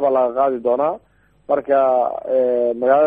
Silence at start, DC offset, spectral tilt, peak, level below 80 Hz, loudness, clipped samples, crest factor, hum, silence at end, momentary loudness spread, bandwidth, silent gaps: 0 s; under 0.1%; -8.5 dB/octave; -2 dBFS; -60 dBFS; -18 LUFS; under 0.1%; 14 dB; none; 0 s; 6 LU; 4.7 kHz; none